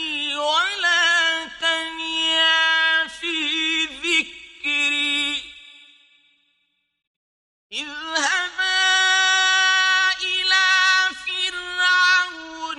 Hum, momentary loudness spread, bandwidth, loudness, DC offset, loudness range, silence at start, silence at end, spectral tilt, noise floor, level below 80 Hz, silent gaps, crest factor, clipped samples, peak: none; 10 LU; 11.5 kHz; -18 LUFS; under 0.1%; 9 LU; 0 s; 0 s; 1.5 dB/octave; -71 dBFS; -62 dBFS; 7.07-7.70 s; 16 dB; under 0.1%; -6 dBFS